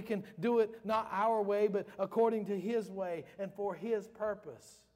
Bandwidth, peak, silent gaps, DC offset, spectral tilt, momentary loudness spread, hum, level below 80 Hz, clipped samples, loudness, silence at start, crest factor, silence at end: 15.5 kHz; -20 dBFS; none; under 0.1%; -7 dB/octave; 10 LU; none; -76 dBFS; under 0.1%; -35 LUFS; 0 s; 16 dB; 0.25 s